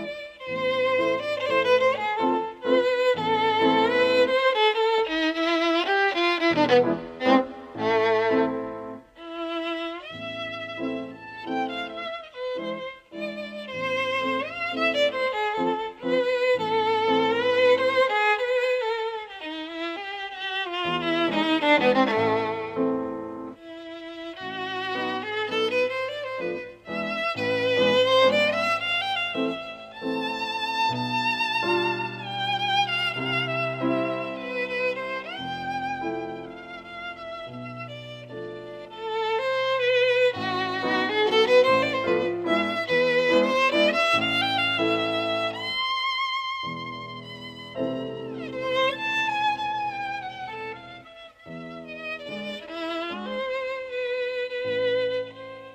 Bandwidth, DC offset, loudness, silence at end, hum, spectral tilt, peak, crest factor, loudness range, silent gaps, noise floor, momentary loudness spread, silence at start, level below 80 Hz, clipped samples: 15 kHz; under 0.1%; -24 LUFS; 0 s; none; -4.5 dB/octave; -8 dBFS; 18 dB; 10 LU; none; -46 dBFS; 16 LU; 0 s; -64 dBFS; under 0.1%